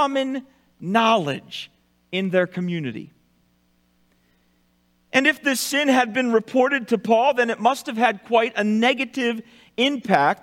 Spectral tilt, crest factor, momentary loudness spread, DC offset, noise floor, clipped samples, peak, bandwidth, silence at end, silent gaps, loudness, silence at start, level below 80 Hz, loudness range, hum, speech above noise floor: -4.5 dB/octave; 20 dB; 14 LU; under 0.1%; -64 dBFS; under 0.1%; -2 dBFS; 16.5 kHz; 0.05 s; none; -21 LUFS; 0 s; -70 dBFS; 9 LU; 60 Hz at -50 dBFS; 43 dB